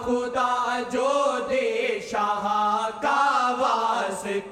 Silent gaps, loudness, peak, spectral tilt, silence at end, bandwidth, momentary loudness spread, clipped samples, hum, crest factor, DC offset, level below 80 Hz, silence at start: none; -24 LUFS; -8 dBFS; -3 dB/octave; 0 s; 15 kHz; 5 LU; under 0.1%; none; 16 dB; under 0.1%; -60 dBFS; 0 s